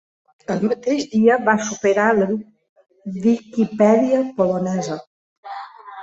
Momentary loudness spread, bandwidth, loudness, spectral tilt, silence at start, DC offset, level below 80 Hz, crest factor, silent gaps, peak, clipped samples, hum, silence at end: 19 LU; 7.8 kHz; -19 LUFS; -6 dB/octave; 0.5 s; under 0.1%; -62 dBFS; 18 dB; 2.69-2.76 s, 5.07-5.43 s; -2 dBFS; under 0.1%; none; 0 s